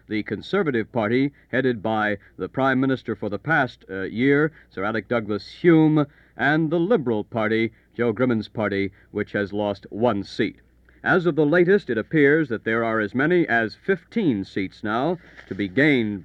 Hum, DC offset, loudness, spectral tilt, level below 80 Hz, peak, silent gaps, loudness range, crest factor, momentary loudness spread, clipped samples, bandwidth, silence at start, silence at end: none; under 0.1%; -22 LUFS; -8 dB/octave; -56 dBFS; -4 dBFS; none; 4 LU; 18 dB; 10 LU; under 0.1%; 7.4 kHz; 0.1 s; 0 s